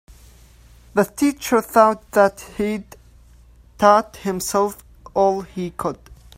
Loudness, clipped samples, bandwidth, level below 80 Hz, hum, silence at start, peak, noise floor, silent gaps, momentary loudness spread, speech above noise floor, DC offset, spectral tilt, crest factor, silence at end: -20 LUFS; under 0.1%; 16 kHz; -48 dBFS; none; 0.95 s; 0 dBFS; -48 dBFS; none; 13 LU; 30 dB; under 0.1%; -5 dB/octave; 20 dB; 0.25 s